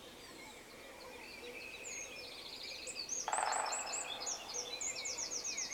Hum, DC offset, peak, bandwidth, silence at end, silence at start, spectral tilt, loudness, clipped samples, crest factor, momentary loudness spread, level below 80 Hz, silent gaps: none; under 0.1%; -22 dBFS; 19.5 kHz; 0 s; 0 s; 0.5 dB/octave; -40 LUFS; under 0.1%; 22 dB; 15 LU; -70 dBFS; none